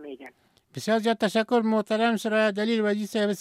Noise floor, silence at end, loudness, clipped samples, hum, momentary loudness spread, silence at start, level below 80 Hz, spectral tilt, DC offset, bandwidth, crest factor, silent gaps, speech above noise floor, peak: -51 dBFS; 0 s; -25 LUFS; under 0.1%; none; 12 LU; 0 s; -76 dBFS; -5 dB/octave; under 0.1%; 15 kHz; 16 dB; none; 27 dB; -10 dBFS